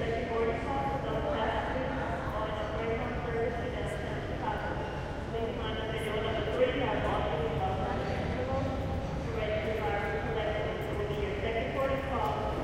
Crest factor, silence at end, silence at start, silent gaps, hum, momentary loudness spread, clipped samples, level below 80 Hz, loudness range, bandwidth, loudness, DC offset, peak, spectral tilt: 16 dB; 0 s; 0 s; none; none; 4 LU; under 0.1%; -42 dBFS; 3 LU; 16 kHz; -33 LUFS; under 0.1%; -16 dBFS; -6.5 dB/octave